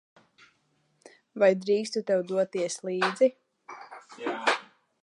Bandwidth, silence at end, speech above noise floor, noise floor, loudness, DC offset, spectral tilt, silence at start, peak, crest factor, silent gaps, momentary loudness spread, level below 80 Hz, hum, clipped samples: 11.5 kHz; 0.4 s; 45 dB; -71 dBFS; -27 LUFS; under 0.1%; -4 dB/octave; 1.35 s; -10 dBFS; 20 dB; none; 21 LU; -84 dBFS; none; under 0.1%